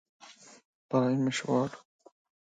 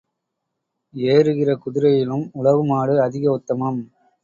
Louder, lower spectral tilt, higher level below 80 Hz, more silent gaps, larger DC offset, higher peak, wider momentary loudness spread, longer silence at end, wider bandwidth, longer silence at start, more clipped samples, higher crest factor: second, -30 LUFS vs -19 LUFS; second, -6 dB/octave vs -8.5 dB/octave; second, -74 dBFS vs -62 dBFS; first, 0.65-0.89 s vs none; neither; second, -14 dBFS vs -2 dBFS; first, 24 LU vs 9 LU; first, 0.75 s vs 0.4 s; first, 9.4 kHz vs 7.4 kHz; second, 0.25 s vs 0.95 s; neither; about the same, 18 dB vs 18 dB